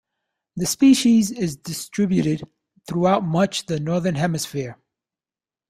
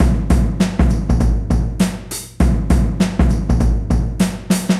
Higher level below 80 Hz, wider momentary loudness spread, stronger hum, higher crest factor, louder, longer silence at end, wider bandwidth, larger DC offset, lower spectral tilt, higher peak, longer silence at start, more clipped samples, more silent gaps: second, -56 dBFS vs -18 dBFS; first, 14 LU vs 4 LU; neither; first, 18 dB vs 12 dB; second, -21 LUFS vs -17 LUFS; first, 0.95 s vs 0 s; first, 15.5 kHz vs 14 kHz; neither; about the same, -5.5 dB/octave vs -6.5 dB/octave; about the same, -4 dBFS vs -2 dBFS; first, 0.55 s vs 0 s; neither; neither